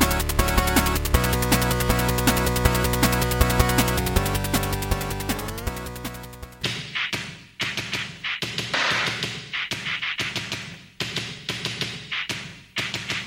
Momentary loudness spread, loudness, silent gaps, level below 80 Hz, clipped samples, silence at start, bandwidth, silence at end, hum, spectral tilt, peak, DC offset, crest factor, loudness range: 11 LU; -24 LUFS; none; -32 dBFS; under 0.1%; 0 s; 17 kHz; 0 s; none; -4 dB/octave; -4 dBFS; under 0.1%; 20 dB; 7 LU